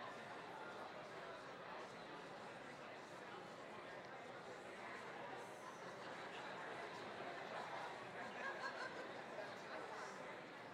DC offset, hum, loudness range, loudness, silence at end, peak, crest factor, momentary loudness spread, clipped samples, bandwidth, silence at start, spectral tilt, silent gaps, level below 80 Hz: under 0.1%; none; 4 LU; -52 LUFS; 0 s; -36 dBFS; 16 dB; 5 LU; under 0.1%; 15.5 kHz; 0 s; -4 dB/octave; none; -88 dBFS